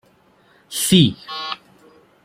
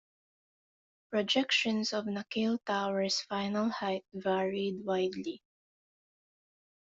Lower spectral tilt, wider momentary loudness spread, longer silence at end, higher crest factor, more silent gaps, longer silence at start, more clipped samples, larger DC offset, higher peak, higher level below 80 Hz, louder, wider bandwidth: about the same, -4.5 dB/octave vs -4 dB/octave; first, 15 LU vs 8 LU; second, 0.7 s vs 1.45 s; about the same, 20 dB vs 20 dB; neither; second, 0.7 s vs 1.1 s; neither; neither; first, -2 dBFS vs -14 dBFS; first, -52 dBFS vs -76 dBFS; first, -18 LUFS vs -32 LUFS; first, 16.5 kHz vs 7.8 kHz